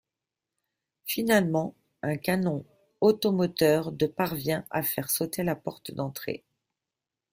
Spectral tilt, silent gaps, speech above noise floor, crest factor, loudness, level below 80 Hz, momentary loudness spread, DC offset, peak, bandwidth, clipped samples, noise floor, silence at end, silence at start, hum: -5 dB/octave; none; 62 dB; 20 dB; -28 LUFS; -64 dBFS; 13 LU; under 0.1%; -10 dBFS; 16 kHz; under 0.1%; -89 dBFS; 0.95 s; 1.05 s; none